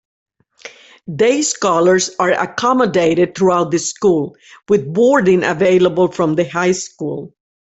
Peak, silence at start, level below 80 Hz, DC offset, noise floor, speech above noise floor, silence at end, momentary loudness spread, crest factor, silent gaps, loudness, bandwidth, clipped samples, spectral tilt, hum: -2 dBFS; 0.65 s; -54 dBFS; under 0.1%; -39 dBFS; 25 dB; 0.4 s; 8 LU; 14 dB; none; -15 LUFS; 8.4 kHz; under 0.1%; -4.5 dB/octave; none